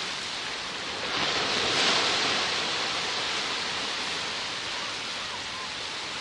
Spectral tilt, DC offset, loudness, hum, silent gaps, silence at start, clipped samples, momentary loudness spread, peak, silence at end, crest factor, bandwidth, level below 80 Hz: -1 dB/octave; under 0.1%; -27 LUFS; none; none; 0 s; under 0.1%; 9 LU; -12 dBFS; 0 s; 18 dB; 11.5 kHz; -62 dBFS